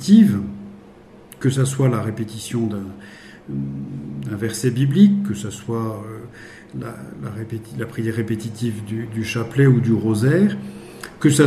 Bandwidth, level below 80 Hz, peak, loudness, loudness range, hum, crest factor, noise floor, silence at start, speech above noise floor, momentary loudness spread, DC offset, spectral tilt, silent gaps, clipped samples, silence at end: 14 kHz; -54 dBFS; -2 dBFS; -20 LUFS; 8 LU; none; 18 dB; -44 dBFS; 0 s; 25 dB; 20 LU; under 0.1%; -6.5 dB/octave; none; under 0.1%; 0 s